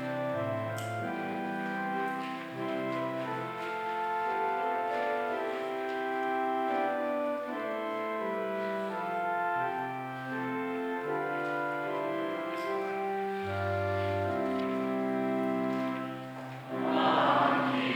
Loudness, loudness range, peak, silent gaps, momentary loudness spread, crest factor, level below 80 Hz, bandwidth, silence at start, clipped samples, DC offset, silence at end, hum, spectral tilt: -32 LUFS; 2 LU; -12 dBFS; none; 5 LU; 20 dB; -78 dBFS; over 20 kHz; 0 s; under 0.1%; under 0.1%; 0 s; none; -6.5 dB/octave